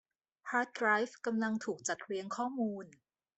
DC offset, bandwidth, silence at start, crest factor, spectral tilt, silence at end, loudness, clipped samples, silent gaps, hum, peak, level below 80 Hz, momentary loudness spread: under 0.1%; 8.2 kHz; 0.45 s; 20 dB; -4 dB/octave; 0.5 s; -35 LUFS; under 0.1%; none; none; -16 dBFS; -82 dBFS; 11 LU